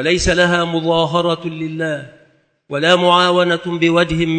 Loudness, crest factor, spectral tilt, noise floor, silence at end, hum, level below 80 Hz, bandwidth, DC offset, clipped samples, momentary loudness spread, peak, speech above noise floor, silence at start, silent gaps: -15 LUFS; 16 dB; -4.5 dB/octave; -54 dBFS; 0 s; none; -38 dBFS; 9.2 kHz; under 0.1%; under 0.1%; 11 LU; 0 dBFS; 39 dB; 0 s; none